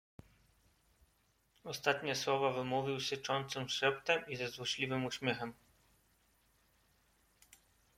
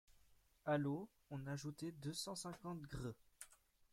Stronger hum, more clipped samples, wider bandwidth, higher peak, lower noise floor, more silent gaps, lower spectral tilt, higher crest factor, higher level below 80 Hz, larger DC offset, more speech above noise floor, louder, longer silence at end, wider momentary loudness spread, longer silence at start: neither; neither; about the same, 16.5 kHz vs 16.5 kHz; first, -16 dBFS vs -28 dBFS; about the same, -75 dBFS vs -72 dBFS; neither; second, -3.5 dB/octave vs -5 dB/octave; about the same, 24 dB vs 20 dB; about the same, -74 dBFS vs -70 dBFS; neither; first, 38 dB vs 26 dB; first, -36 LUFS vs -47 LUFS; first, 2.45 s vs 0.4 s; second, 7 LU vs 17 LU; first, 1.65 s vs 0.1 s